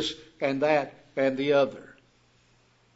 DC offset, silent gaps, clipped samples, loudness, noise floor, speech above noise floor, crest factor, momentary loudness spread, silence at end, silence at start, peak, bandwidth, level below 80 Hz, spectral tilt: under 0.1%; none; under 0.1%; -27 LUFS; -63 dBFS; 37 dB; 20 dB; 10 LU; 1.1 s; 0 s; -8 dBFS; 8 kHz; -68 dBFS; -5 dB/octave